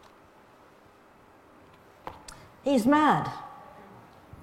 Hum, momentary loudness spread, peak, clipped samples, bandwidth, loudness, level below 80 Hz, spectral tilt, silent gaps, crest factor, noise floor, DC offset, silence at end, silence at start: none; 27 LU; -10 dBFS; under 0.1%; 15.5 kHz; -25 LUFS; -64 dBFS; -6 dB/octave; none; 20 dB; -56 dBFS; under 0.1%; 0.85 s; 2.05 s